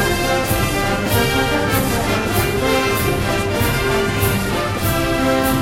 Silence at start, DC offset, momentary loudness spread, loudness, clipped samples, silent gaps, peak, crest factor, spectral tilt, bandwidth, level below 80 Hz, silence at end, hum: 0 s; under 0.1%; 2 LU; -17 LUFS; under 0.1%; none; -2 dBFS; 14 dB; -4.5 dB/octave; 16.5 kHz; -30 dBFS; 0 s; none